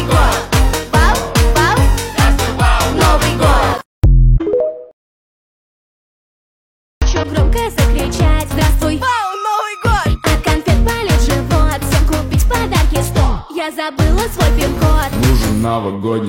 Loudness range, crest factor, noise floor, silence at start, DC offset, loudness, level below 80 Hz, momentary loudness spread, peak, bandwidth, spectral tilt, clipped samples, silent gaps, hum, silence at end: 6 LU; 12 dB; under -90 dBFS; 0 s; under 0.1%; -14 LUFS; -16 dBFS; 5 LU; 0 dBFS; 16.5 kHz; -5 dB/octave; under 0.1%; 3.85-4.02 s, 4.93-7.01 s; none; 0 s